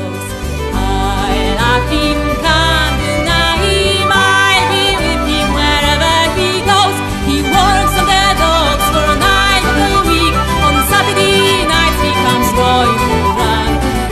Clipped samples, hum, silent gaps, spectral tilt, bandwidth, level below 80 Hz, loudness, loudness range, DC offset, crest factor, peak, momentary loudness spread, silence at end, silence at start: under 0.1%; none; none; -4 dB/octave; 13.5 kHz; -22 dBFS; -11 LUFS; 2 LU; under 0.1%; 12 dB; 0 dBFS; 5 LU; 0 s; 0 s